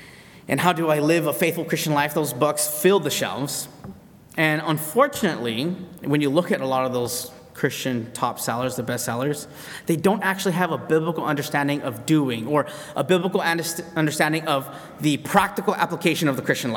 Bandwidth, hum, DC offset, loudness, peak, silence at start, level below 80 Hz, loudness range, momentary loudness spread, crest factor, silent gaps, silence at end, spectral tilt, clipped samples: 19 kHz; none; under 0.1%; -23 LUFS; -2 dBFS; 0 s; -62 dBFS; 3 LU; 8 LU; 20 dB; none; 0 s; -4.5 dB/octave; under 0.1%